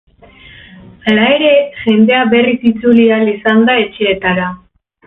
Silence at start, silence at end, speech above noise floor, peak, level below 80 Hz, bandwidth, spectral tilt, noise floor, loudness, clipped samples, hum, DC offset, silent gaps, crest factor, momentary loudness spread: 1.05 s; 0.5 s; 29 dB; 0 dBFS; -48 dBFS; 4 kHz; -8 dB/octave; -39 dBFS; -11 LUFS; under 0.1%; none; under 0.1%; none; 12 dB; 6 LU